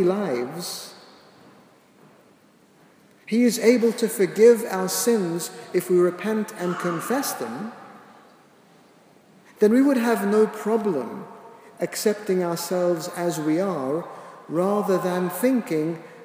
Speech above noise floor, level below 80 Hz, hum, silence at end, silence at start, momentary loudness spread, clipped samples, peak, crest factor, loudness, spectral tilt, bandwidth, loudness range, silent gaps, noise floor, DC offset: 34 dB; -80 dBFS; none; 0 s; 0 s; 14 LU; under 0.1%; -4 dBFS; 20 dB; -23 LUFS; -5 dB/octave; 16 kHz; 7 LU; none; -56 dBFS; under 0.1%